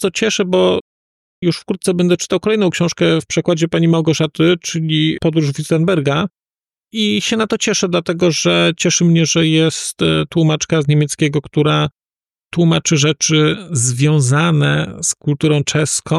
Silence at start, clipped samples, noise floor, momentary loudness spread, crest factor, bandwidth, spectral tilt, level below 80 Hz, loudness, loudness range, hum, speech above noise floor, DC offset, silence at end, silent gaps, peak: 0 s; under 0.1%; under -90 dBFS; 5 LU; 12 dB; 12.5 kHz; -4.5 dB/octave; -50 dBFS; -15 LUFS; 2 LU; none; over 75 dB; under 0.1%; 0 s; 0.81-1.42 s; -4 dBFS